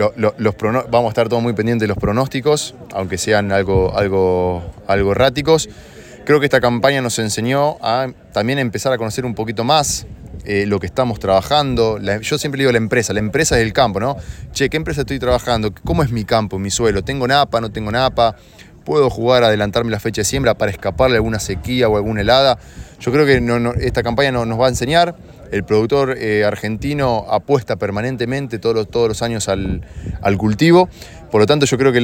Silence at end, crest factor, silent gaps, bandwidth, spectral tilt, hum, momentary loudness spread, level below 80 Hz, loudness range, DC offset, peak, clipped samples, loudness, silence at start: 0 s; 16 dB; none; 17 kHz; -5 dB/octave; none; 8 LU; -36 dBFS; 2 LU; under 0.1%; 0 dBFS; under 0.1%; -16 LUFS; 0 s